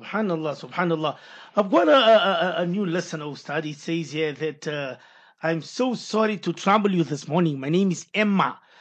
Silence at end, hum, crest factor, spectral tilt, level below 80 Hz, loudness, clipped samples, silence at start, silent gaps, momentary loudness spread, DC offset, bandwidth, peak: 0.25 s; none; 18 dB; -5.5 dB/octave; -78 dBFS; -23 LUFS; under 0.1%; 0 s; none; 12 LU; under 0.1%; 8.8 kHz; -4 dBFS